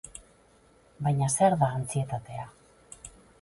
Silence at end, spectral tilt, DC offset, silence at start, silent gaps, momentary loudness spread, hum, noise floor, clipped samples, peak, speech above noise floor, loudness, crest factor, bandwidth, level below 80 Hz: 0.35 s; -6 dB/octave; under 0.1%; 0.05 s; none; 24 LU; none; -60 dBFS; under 0.1%; -10 dBFS; 34 dB; -27 LUFS; 20 dB; 11.5 kHz; -58 dBFS